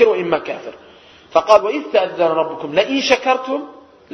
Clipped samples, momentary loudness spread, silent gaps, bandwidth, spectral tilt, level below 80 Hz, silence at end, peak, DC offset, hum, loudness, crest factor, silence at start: under 0.1%; 14 LU; none; 9.4 kHz; -4 dB/octave; -58 dBFS; 0.35 s; 0 dBFS; under 0.1%; none; -17 LUFS; 18 dB; 0 s